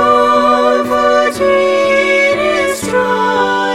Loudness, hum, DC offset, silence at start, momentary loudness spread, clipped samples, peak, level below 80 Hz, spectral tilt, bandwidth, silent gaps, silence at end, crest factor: -11 LUFS; none; 0.5%; 0 s; 4 LU; under 0.1%; 0 dBFS; -46 dBFS; -3.5 dB/octave; 15.5 kHz; none; 0 s; 12 dB